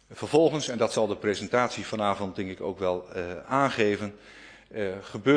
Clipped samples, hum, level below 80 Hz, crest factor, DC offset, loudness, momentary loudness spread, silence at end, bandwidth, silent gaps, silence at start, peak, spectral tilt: under 0.1%; none; -62 dBFS; 20 dB; under 0.1%; -28 LUFS; 12 LU; 0 s; 10.5 kHz; none; 0.1 s; -8 dBFS; -5 dB/octave